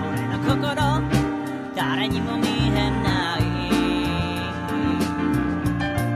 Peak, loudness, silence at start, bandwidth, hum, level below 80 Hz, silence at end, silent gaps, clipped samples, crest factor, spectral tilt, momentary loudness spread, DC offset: -6 dBFS; -23 LUFS; 0 s; 15 kHz; none; -36 dBFS; 0 s; none; under 0.1%; 16 dB; -6 dB/octave; 5 LU; under 0.1%